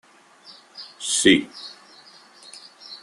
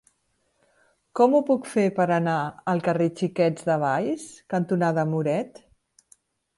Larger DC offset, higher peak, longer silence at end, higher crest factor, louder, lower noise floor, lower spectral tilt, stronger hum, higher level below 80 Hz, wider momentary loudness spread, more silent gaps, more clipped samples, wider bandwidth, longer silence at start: neither; first, -2 dBFS vs -8 dBFS; second, 0.05 s vs 1.1 s; first, 24 dB vs 18 dB; first, -19 LUFS vs -24 LUFS; second, -50 dBFS vs -71 dBFS; second, -2 dB/octave vs -7 dB/octave; neither; first, -62 dBFS vs -68 dBFS; first, 26 LU vs 9 LU; neither; neither; about the same, 12.5 kHz vs 11.5 kHz; second, 0.8 s vs 1.15 s